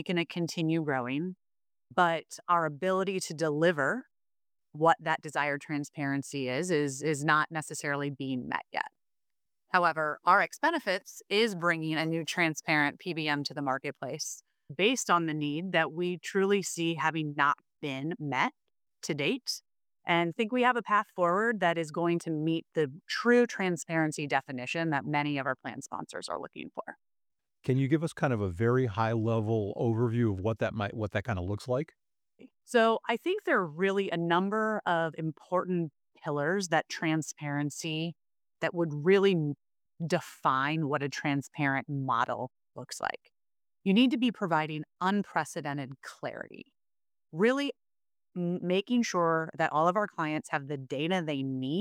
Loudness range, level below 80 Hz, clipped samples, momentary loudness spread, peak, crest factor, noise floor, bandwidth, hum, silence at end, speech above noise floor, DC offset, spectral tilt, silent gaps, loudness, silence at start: 4 LU; -70 dBFS; under 0.1%; 11 LU; -10 dBFS; 20 dB; under -90 dBFS; 17 kHz; none; 0 s; over 60 dB; under 0.1%; -5 dB/octave; none; -30 LUFS; 0 s